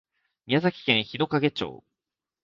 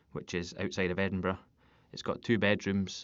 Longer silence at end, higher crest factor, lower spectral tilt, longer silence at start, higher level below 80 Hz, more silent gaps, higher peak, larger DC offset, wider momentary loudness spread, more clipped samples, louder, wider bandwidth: first, 0.7 s vs 0 s; about the same, 24 dB vs 22 dB; first, -7 dB/octave vs -4.5 dB/octave; first, 0.5 s vs 0.15 s; about the same, -64 dBFS vs -62 dBFS; neither; first, -4 dBFS vs -12 dBFS; neither; second, 8 LU vs 11 LU; neither; first, -25 LUFS vs -33 LUFS; about the same, 7.4 kHz vs 7.8 kHz